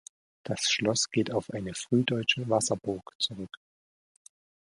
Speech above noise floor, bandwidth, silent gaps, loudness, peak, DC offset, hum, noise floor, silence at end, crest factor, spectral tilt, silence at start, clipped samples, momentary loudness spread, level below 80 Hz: over 61 dB; 11.5 kHz; 3.15-3.19 s; -29 LUFS; -10 dBFS; under 0.1%; none; under -90 dBFS; 1.25 s; 22 dB; -3.5 dB/octave; 0.45 s; under 0.1%; 11 LU; -64 dBFS